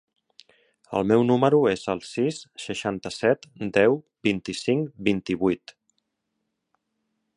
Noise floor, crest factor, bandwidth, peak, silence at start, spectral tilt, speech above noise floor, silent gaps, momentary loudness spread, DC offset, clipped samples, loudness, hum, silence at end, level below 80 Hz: -79 dBFS; 20 dB; 11 kHz; -4 dBFS; 0.9 s; -6 dB/octave; 55 dB; none; 10 LU; under 0.1%; under 0.1%; -24 LUFS; none; 1.8 s; -60 dBFS